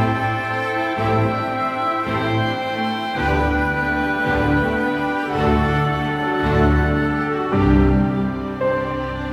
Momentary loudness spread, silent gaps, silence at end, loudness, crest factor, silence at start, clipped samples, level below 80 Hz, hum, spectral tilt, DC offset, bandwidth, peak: 6 LU; none; 0 s; -19 LUFS; 16 dB; 0 s; under 0.1%; -30 dBFS; none; -7.5 dB/octave; under 0.1%; 13.5 kHz; -4 dBFS